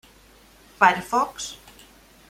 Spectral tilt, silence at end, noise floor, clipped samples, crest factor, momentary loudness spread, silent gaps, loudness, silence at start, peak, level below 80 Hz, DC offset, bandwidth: -2.5 dB/octave; 0.75 s; -53 dBFS; under 0.1%; 24 dB; 16 LU; none; -22 LUFS; 0.8 s; -2 dBFS; -58 dBFS; under 0.1%; 16.5 kHz